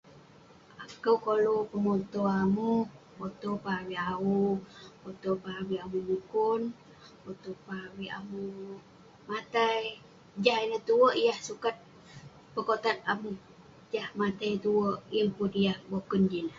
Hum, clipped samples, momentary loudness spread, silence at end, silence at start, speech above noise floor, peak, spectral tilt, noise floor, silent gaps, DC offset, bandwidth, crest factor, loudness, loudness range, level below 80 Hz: none; under 0.1%; 18 LU; 0 s; 0.05 s; 26 dB; -8 dBFS; -6 dB/octave; -56 dBFS; none; under 0.1%; 7.6 kHz; 22 dB; -31 LUFS; 6 LU; -66 dBFS